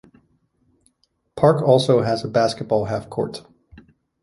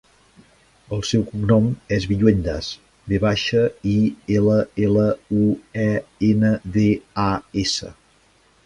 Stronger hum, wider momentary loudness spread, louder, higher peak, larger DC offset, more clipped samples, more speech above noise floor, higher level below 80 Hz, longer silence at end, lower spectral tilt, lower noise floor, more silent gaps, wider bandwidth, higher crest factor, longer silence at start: neither; first, 13 LU vs 8 LU; about the same, -19 LUFS vs -20 LUFS; about the same, -2 dBFS vs -2 dBFS; neither; neither; first, 49 dB vs 38 dB; second, -54 dBFS vs -42 dBFS; second, 0.45 s vs 0.75 s; about the same, -6.5 dB/octave vs -6.5 dB/octave; first, -67 dBFS vs -57 dBFS; neither; about the same, 11.5 kHz vs 11 kHz; about the same, 20 dB vs 18 dB; first, 1.35 s vs 0.9 s